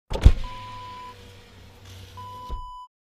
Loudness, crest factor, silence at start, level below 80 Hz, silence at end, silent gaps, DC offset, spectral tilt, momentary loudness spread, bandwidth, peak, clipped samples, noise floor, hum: -28 LUFS; 24 dB; 0.1 s; -26 dBFS; 0.25 s; none; under 0.1%; -6.5 dB/octave; 26 LU; 10.5 kHz; 0 dBFS; under 0.1%; -48 dBFS; none